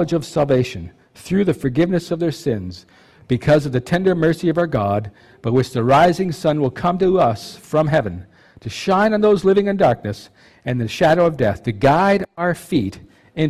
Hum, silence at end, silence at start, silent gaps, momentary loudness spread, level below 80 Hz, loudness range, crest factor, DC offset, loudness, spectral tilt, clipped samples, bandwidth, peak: none; 0 s; 0 s; none; 14 LU; -44 dBFS; 3 LU; 12 dB; under 0.1%; -18 LUFS; -7 dB/octave; under 0.1%; 14.5 kHz; -6 dBFS